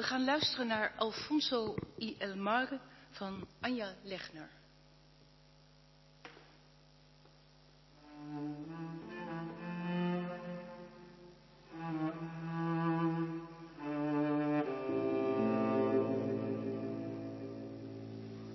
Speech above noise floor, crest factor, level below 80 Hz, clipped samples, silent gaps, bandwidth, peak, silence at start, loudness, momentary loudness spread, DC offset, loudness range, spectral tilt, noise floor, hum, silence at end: 26 dB; 20 dB; -70 dBFS; under 0.1%; none; 6 kHz; -18 dBFS; 0 s; -37 LUFS; 19 LU; under 0.1%; 14 LU; -4 dB/octave; -63 dBFS; none; 0 s